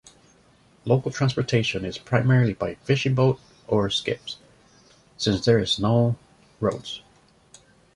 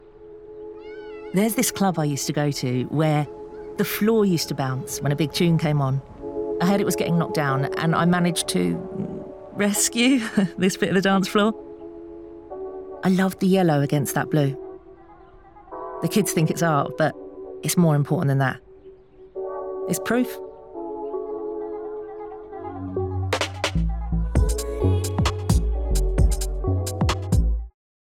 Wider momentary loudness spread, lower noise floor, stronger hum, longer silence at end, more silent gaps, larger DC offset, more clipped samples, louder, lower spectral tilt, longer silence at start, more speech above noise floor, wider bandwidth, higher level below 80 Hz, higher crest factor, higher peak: second, 14 LU vs 17 LU; first, -57 dBFS vs -48 dBFS; neither; first, 0.95 s vs 0.35 s; neither; second, under 0.1% vs 0.1%; neither; about the same, -23 LUFS vs -23 LUFS; about the same, -6 dB/octave vs -5.5 dB/octave; first, 0.85 s vs 0.05 s; first, 35 dB vs 27 dB; second, 11 kHz vs 18.5 kHz; second, -52 dBFS vs -32 dBFS; first, 20 dB vs 14 dB; first, -4 dBFS vs -8 dBFS